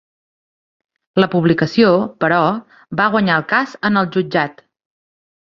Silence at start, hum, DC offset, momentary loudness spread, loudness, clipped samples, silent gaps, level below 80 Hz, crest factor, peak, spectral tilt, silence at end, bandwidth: 1.15 s; none; under 0.1%; 7 LU; -16 LUFS; under 0.1%; none; -56 dBFS; 16 dB; 0 dBFS; -7.5 dB/octave; 1 s; 7.2 kHz